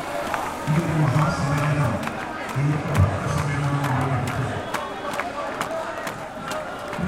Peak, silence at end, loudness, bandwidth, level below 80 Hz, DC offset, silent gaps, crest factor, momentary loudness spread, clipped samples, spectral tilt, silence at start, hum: -6 dBFS; 0 s; -24 LUFS; 16 kHz; -44 dBFS; under 0.1%; none; 18 dB; 9 LU; under 0.1%; -6 dB/octave; 0 s; none